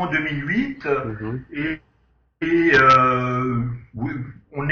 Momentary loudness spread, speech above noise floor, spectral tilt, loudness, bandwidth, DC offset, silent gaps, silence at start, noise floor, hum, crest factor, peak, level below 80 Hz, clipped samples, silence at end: 16 LU; 42 dB; -7 dB/octave; -20 LUFS; 7 kHz; under 0.1%; none; 0 s; -62 dBFS; none; 18 dB; -4 dBFS; -46 dBFS; under 0.1%; 0 s